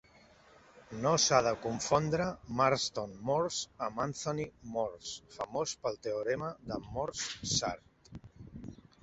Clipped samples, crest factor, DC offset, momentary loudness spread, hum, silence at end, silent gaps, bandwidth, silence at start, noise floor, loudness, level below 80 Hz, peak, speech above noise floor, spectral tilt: under 0.1%; 24 dB; under 0.1%; 20 LU; none; 0.3 s; none; 8 kHz; 0.75 s; -61 dBFS; -33 LUFS; -60 dBFS; -10 dBFS; 28 dB; -3.5 dB/octave